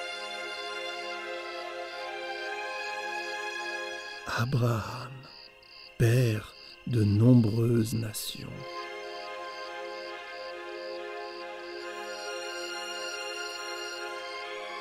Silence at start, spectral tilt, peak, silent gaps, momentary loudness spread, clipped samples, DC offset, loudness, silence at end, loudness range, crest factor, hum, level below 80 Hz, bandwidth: 0 s; -6 dB/octave; -10 dBFS; none; 13 LU; under 0.1%; under 0.1%; -32 LUFS; 0 s; 11 LU; 20 dB; none; -60 dBFS; 15.5 kHz